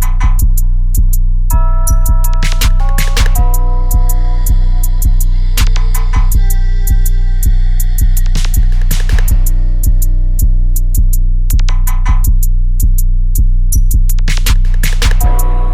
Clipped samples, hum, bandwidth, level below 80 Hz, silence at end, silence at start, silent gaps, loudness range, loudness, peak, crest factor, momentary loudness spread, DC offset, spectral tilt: under 0.1%; 60 Hz at -30 dBFS; 15.5 kHz; -8 dBFS; 0 s; 0 s; none; 1 LU; -14 LUFS; 0 dBFS; 8 dB; 2 LU; under 0.1%; -4 dB/octave